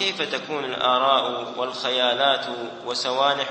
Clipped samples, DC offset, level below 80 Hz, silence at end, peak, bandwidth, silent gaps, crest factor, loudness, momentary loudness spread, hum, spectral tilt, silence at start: under 0.1%; under 0.1%; -72 dBFS; 0 s; -4 dBFS; 8.8 kHz; none; 20 dB; -22 LUFS; 9 LU; none; -2.5 dB/octave; 0 s